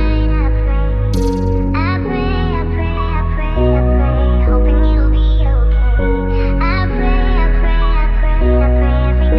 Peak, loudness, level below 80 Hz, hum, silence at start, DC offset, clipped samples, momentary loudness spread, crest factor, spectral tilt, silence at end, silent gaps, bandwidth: -2 dBFS; -15 LUFS; -14 dBFS; none; 0 s; under 0.1%; under 0.1%; 4 LU; 10 dB; -8.5 dB/octave; 0 s; none; 5.2 kHz